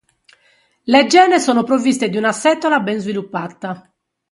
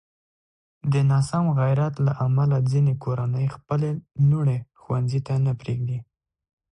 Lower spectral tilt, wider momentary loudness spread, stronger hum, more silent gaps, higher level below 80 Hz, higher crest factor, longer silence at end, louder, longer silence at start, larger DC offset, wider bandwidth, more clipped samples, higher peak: second, -4 dB/octave vs -8.5 dB/octave; first, 17 LU vs 8 LU; neither; neither; second, -64 dBFS vs -54 dBFS; about the same, 16 dB vs 12 dB; second, 0.5 s vs 0.7 s; first, -15 LUFS vs -23 LUFS; about the same, 0.85 s vs 0.85 s; neither; about the same, 11.5 kHz vs 10.5 kHz; neither; first, 0 dBFS vs -12 dBFS